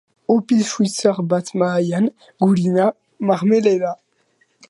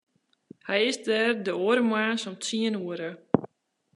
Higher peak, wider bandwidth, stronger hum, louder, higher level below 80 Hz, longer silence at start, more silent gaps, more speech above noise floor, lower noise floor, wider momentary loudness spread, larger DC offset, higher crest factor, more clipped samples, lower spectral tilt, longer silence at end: about the same, -2 dBFS vs -4 dBFS; about the same, 11.5 kHz vs 11.5 kHz; neither; first, -18 LUFS vs -27 LUFS; first, -66 dBFS vs -74 dBFS; second, 0.3 s vs 0.65 s; neither; first, 45 dB vs 38 dB; about the same, -62 dBFS vs -64 dBFS; about the same, 6 LU vs 8 LU; neither; second, 16 dB vs 24 dB; neither; first, -6 dB/octave vs -4 dB/octave; first, 0.75 s vs 0.5 s